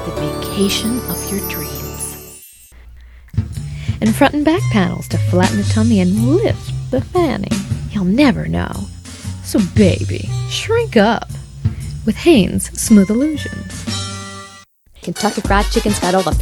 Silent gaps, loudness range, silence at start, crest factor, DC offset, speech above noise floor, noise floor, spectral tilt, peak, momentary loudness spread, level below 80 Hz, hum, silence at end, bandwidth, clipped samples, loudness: none; 6 LU; 0 s; 16 dB; under 0.1%; 28 dB; -43 dBFS; -5.5 dB/octave; 0 dBFS; 13 LU; -32 dBFS; none; 0 s; 18.5 kHz; under 0.1%; -16 LUFS